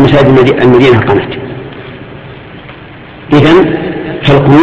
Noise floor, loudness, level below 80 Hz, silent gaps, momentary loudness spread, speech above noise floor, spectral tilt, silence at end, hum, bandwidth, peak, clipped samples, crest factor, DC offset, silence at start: -29 dBFS; -7 LUFS; -32 dBFS; none; 23 LU; 24 dB; -8 dB/octave; 0 s; none; 7.8 kHz; 0 dBFS; 0.7%; 8 dB; under 0.1%; 0 s